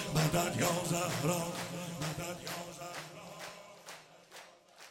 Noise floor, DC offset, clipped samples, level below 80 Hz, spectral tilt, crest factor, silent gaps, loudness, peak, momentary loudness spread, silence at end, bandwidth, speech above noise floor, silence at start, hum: -56 dBFS; under 0.1%; under 0.1%; -60 dBFS; -4 dB/octave; 20 dB; none; -35 LUFS; -16 dBFS; 22 LU; 0 s; 16.5 kHz; 22 dB; 0 s; none